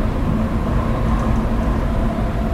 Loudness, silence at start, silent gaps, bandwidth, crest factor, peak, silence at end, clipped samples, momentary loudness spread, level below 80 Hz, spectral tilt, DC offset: -20 LUFS; 0 s; none; 13 kHz; 12 dB; -6 dBFS; 0 s; under 0.1%; 1 LU; -22 dBFS; -8 dB/octave; under 0.1%